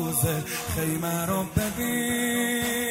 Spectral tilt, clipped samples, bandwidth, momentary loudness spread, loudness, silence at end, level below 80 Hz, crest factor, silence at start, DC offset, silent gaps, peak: -4 dB/octave; under 0.1%; 16.5 kHz; 3 LU; -26 LUFS; 0 s; -46 dBFS; 18 dB; 0 s; under 0.1%; none; -10 dBFS